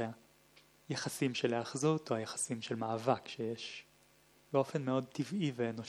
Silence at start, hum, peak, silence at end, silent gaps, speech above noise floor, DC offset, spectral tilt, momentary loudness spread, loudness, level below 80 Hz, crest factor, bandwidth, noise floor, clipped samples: 0 s; none; -18 dBFS; 0 s; none; 31 dB; under 0.1%; -5 dB/octave; 9 LU; -37 LUFS; -80 dBFS; 20 dB; 17.5 kHz; -67 dBFS; under 0.1%